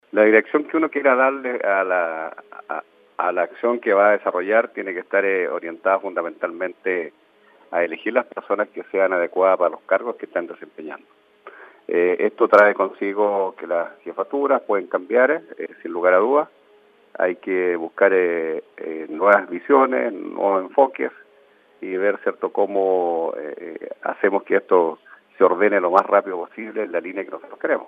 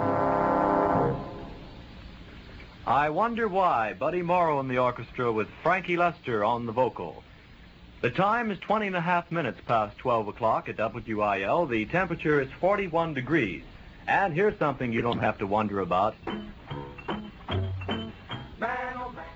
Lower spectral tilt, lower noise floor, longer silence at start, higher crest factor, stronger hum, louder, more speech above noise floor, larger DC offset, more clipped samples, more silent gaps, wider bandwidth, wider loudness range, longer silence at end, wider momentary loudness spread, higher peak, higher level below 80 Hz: about the same, -7.5 dB/octave vs -7.5 dB/octave; first, -54 dBFS vs -50 dBFS; first, 0.15 s vs 0 s; about the same, 20 dB vs 16 dB; neither; first, -20 LUFS vs -27 LUFS; first, 34 dB vs 24 dB; neither; neither; neither; second, 5.4 kHz vs 8 kHz; about the same, 4 LU vs 3 LU; about the same, 0 s vs 0 s; about the same, 15 LU vs 15 LU; first, 0 dBFS vs -12 dBFS; second, -82 dBFS vs -52 dBFS